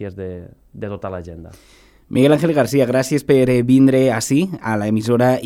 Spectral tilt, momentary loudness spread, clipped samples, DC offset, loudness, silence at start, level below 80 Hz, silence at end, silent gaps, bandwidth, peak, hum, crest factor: -6.5 dB/octave; 18 LU; under 0.1%; under 0.1%; -16 LUFS; 0 s; -48 dBFS; 0 s; none; 16 kHz; 0 dBFS; none; 16 dB